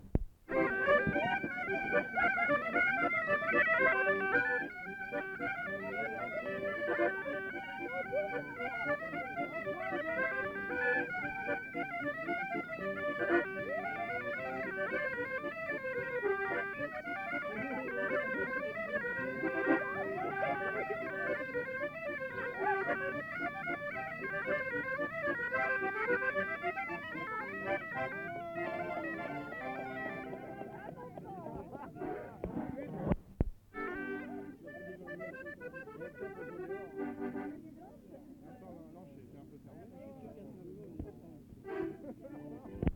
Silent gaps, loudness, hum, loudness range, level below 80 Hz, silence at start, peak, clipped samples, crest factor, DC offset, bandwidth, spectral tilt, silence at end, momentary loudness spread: none; -36 LUFS; none; 14 LU; -56 dBFS; 0 s; -14 dBFS; under 0.1%; 24 dB; under 0.1%; 19 kHz; -7 dB/octave; 0 s; 17 LU